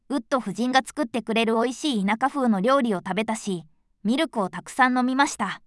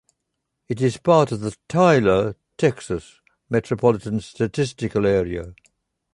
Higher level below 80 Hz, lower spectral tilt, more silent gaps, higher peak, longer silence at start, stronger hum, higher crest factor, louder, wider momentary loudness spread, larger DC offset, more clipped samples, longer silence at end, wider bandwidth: second, -64 dBFS vs -48 dBFS; second, -4.5 dB/octave vs -6.5 dB/octave; neither; about the same, -4 dBFS vs -2 dBFS; second, 0.1 s vs 0.7 s; neither; about the same, 20 dB vs 18 dB; second, -24 LUFS vs -21 LUFS; second, 8 LU vs 13 LU; neither; neither; second, 0.1 s vs 0.6 s; about the same, 12 kHz vs 11.5 kHz